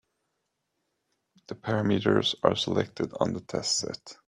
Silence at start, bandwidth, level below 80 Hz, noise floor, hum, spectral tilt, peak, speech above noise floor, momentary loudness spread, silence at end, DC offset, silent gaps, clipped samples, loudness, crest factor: 1.5 s; 12 kHz; -64 dBFS; -80 dBFS; none; -4.5 dB/octave; -4 dBFS; 52 dB; 10 LU; 0.15 s; under 0.1%; none; under 0.1%; -27 LUFS; 26 dB